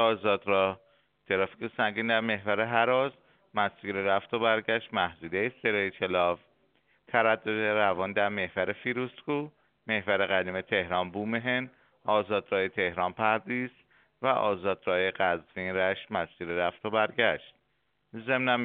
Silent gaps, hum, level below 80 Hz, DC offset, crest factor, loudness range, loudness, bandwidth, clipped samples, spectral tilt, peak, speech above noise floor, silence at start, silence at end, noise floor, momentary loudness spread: none; none; -68 dBFS; under 0.1%; 22 dB; 2 LU; -29 LUFS; 4.6 kHz; under 0.1%; -2.5 dB/octave; -8 dBFS; 47 dB; 0 s; 0 s; -75 dBFS; 8 LU